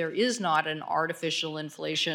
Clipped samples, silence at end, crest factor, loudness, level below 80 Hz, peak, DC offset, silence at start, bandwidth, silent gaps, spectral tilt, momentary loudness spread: under 0.1%; 0 s; 20 dB; -29 LUFS; -80 dBFS; -10 dBFS; under 0.1%; 0 s; 18 kHz; none; -3 dB/octave; 6 LU